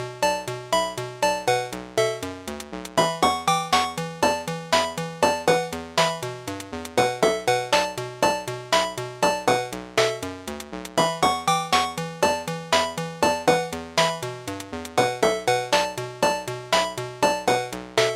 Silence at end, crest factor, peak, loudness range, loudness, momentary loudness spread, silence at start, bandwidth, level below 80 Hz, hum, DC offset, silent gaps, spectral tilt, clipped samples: 0 s; 20 dB; -4 dBFS; 1 LU; -24 LUFS; 10 LU; 0 s; 16.5 kHz; -54 dBFS; none; under 0.1%; none; -3 dB/octave; under 0.1%